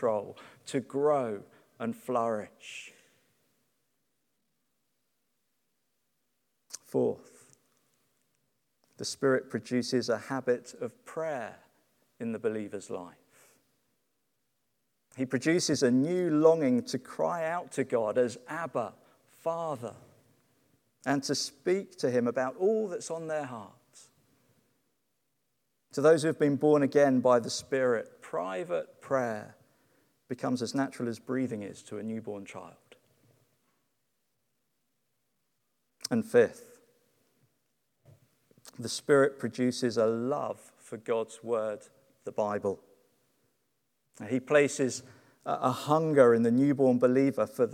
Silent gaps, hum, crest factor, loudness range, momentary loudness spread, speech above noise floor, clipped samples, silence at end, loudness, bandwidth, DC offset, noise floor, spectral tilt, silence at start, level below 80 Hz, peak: none; none; 24 dB; 12 LU; 17 LU; 51 dB; under 0.1%; 0 s; -30 LUFS; 15.5 kHz; under 0.1%; -80 dBFS; -5.5 dB/octave; 0 s; -82 dBFS; -8 dBFS